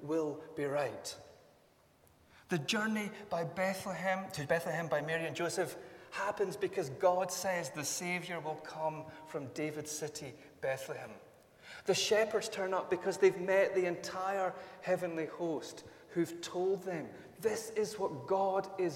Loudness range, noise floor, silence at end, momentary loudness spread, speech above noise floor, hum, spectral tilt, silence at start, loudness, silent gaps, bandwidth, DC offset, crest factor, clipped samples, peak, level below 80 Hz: 6 LU; -67 dBFS; 0 s; 13 LU; 31 dB; none; -4 dB/octave; 0 s; -36 LUFS; none; 17 kHz; under 0.1%; 20 dB; under 0.1%; -16 dBFS; -76 dBFS